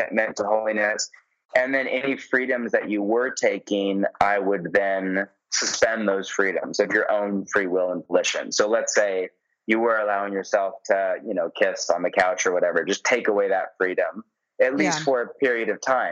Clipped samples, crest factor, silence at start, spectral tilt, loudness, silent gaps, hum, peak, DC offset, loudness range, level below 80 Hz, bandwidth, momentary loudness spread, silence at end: under 0.1%; 18 dB; 0 s; -3 dB/octave; -23 LUFS; 1.45-1.49 s; none; -6 dBFS; under 0.1%; 1 LU; -66 dBFS; 8.6 kHz; 4 LU; 0 s